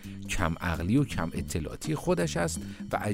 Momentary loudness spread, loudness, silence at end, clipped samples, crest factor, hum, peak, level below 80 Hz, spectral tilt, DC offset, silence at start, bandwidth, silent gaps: 7 LU; -30 LUFS; 0 s; under 0.1%; 18 dB; none; -12 dBFS; -42 dBFS; -5.5 dB/octave; under 0.1%; 0 s; 16 kHz; none